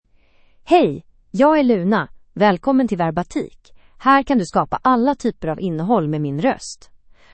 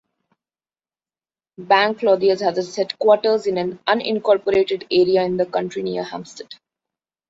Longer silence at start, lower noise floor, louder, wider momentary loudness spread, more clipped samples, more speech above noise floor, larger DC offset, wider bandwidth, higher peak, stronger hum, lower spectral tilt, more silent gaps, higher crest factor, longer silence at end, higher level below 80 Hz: second, 0.65 s vs 1.6 s; second, -53 dBFS vs under -90 dBFS; about the same, -18 LUFS vs -19 LUFS; about the same, 13 LU vs 11 LU; neither; second, 36 dB vs over 71 dB; neither; first, 8.8 kHz vs 7.8 kHz; about the same, -2 dBFS vs -2 dBFS; neither; first, -6.5 dB/octave vs -5 dB/octave; neither; about the same, 16 dB vs 18 dB; second, 0.6 s vs 0.75 s; first, -48 dBFS vs -62 dBFS